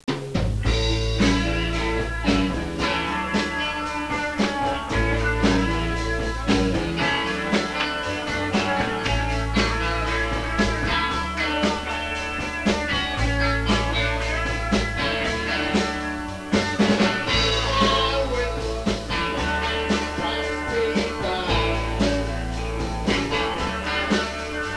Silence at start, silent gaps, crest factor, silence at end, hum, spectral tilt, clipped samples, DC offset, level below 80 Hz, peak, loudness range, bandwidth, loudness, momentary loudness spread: 0.05 s; none; 12 dB; 0 s; none; -5 dB/octave; under 0.1%; 0.3%; -32 dBFS; -10 dBFS; 2 LU; 11 kHz; -23 LUFS; 5 LU